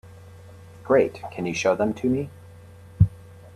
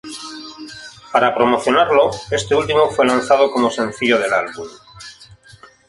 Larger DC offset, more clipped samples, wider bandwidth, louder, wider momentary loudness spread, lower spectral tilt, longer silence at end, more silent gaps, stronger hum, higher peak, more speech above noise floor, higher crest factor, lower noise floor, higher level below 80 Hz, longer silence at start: neither; neither; about the same, 12.5 kHz vs 11.5 kHz; second, -24 LUFS vs -16 LUFS; second, 10 LU vs 20 LU; first, -7 dB/octave vs -4 dB/octave; second, 0.4 s vs 0.65 s; neither; neither; second, -4 dBFS vs 0 dBFS; second, 23 dB vs 30 dB; about the same, 20 dB vs 18 dB; about the same, -46 dBFS vs -45 dBFS; first, -44 dBFS vs -52 dBFS; about the same, 0.05 s vs 0.05 s